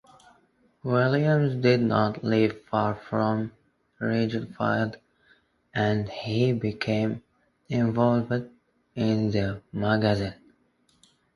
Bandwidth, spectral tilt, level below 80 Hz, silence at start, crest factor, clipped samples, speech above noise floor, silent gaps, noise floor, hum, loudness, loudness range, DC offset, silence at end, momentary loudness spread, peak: 11.5 kHz; -8 dB/octave; -56 dBFS; 0.85 s; 20 dB; under 0.1%; 42 dB; none; -66 dBFS; none; -26 LUFS; 4 LU; under 0.1%; 1.05 s; 9 LU; -6 dBFS